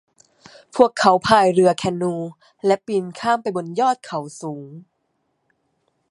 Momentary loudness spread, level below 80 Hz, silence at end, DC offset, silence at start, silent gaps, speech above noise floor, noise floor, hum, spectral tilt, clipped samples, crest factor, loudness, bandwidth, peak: 17 LU; -60 dBFS; 1.3 s; under 0.1%; 0.75 s; none; 52 dB; -71 dBFS; none; -5 dB/octave; under 0.1%; 20 dB; -19 LUFS; 11.5 kHz; 0 dBFS